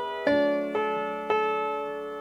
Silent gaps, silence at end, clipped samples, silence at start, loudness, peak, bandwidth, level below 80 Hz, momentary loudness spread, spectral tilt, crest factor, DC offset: none; 0 s; under 0.1%; 0 s; -27 LUFS; -12 dBFS; 12 kHz; -64 dBFS; 6 LU; -5.5 dB/octave; 16 dB; under 0.1%